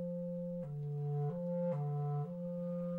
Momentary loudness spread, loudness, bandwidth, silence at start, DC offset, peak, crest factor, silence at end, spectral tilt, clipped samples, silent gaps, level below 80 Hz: 5 LU; -39 LUFS; 2.9 kHz; 0 s; under 0.1%; -28 dBFS; 10 dB; 0 s; -12 dB/octave; under 0.1%; none; -72 dBFS